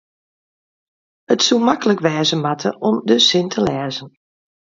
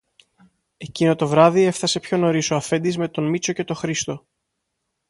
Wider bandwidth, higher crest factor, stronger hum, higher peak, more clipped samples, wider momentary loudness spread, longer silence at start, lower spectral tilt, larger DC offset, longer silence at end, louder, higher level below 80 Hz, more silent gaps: second, 7.8 kHz vs 11.5 kHz; about the same, 18 dB vs 20 dB; neither; about the same, 0 dBFS vs 0 dBFS; neither; second, 9 LU vs 12 LU; first, 1.3 s vs 0.8 s; about the same, -4 dB/octave vs -5 dB/octave; neither; second, 0.6 s vs 0.9 s; first, -16 LUFS vs -20 LUFS; about the same, -58 dBFS vs -60 dBFS; neither